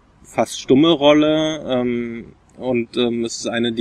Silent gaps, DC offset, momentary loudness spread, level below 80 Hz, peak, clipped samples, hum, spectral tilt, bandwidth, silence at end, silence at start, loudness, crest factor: none; under 0.1%; 13 LU; -52 dBFS; -2 dBFS; under 0.1%; none; -5 dB/octave; 12.5 kHz; 0 s; 0.3 s; -18 LUFS; 16 dB